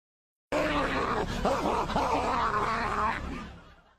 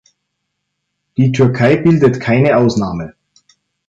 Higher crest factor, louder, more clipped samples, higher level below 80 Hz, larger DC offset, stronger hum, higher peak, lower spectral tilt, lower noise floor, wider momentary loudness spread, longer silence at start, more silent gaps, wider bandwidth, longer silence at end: about the same, 18 dB vs 14 dB; second, -29 LUFS vs -13 LUFS; neither; about the same, -42 dBFS vs -46 dBFS; neither; neither; second, -12 dBFS vs -2 dBFS; second, -5 dB/octave vs -7.5 dB/octave; second, -51 dBFS vs -73 dBFS; second, 7 LU vs 13 LU; second, 0.5 s vs 1.2 s; neither; first, 15 kHz vs 7.8 kHz; second, 0.3 s vs 0.8 s